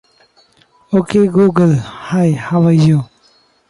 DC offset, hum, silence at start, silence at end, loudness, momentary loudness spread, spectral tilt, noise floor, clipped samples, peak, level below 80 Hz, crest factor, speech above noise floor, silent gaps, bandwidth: under 0.1%; none; 0.9 s; 0.65 s; -13 LUFS; 7 LU; -8.5 dB/octave; -53 dBFS; under 0.1%; 0 dBFS; -50 dBFS; 14 dB; 41 dB; none; 11.5 kHz